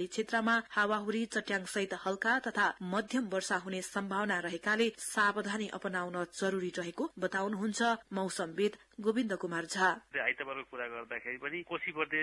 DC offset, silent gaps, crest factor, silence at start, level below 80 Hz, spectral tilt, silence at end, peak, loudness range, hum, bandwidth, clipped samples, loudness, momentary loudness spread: under 0.1%; none; 20 dB; 0 s; -74 dBFS; -4 dB/octave; 0 s; -14 dBFS; 2 LU; none; 12 kHz; under 0.1%; -34 LUFS; 8 LU